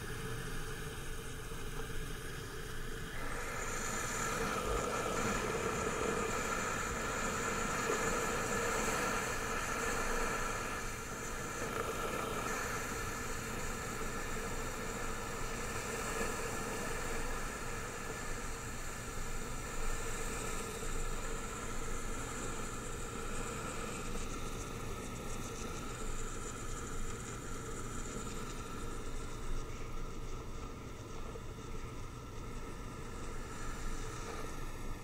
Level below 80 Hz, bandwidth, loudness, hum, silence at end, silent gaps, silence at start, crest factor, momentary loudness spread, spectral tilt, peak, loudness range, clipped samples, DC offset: -44 dBFS; 16 kHz; -40 LUFS; none; 0 s; none; 0 s; 16 dB; 11 LU; -3.5 dB/octave; -22 dBFS; 10 LU; under 0.1%; under 0.1%